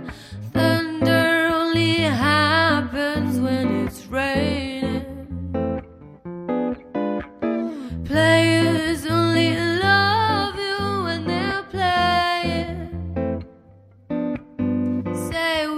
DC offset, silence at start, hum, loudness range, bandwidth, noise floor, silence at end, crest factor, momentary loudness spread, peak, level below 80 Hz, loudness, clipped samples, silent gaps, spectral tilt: under 0.1%; 0 s; none; 7 LU; 15.5 kHz; -49 dBFS; 0 s; 18 dB; 13 LU; -4 dBFS; -46 dBFS; -21 LUFS; under 0.1%; none; -5.5 dB/octave